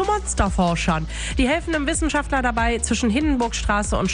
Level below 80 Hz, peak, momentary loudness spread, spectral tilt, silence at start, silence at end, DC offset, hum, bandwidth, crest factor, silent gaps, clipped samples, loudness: -28 dBFS; -4 dBFS; 2 LU; -4.5 dB/octave; 0 s; 0 s; under 0.1%; none; 10.5 kHz; 16 dB; none; under 0.1%; -21 LUFS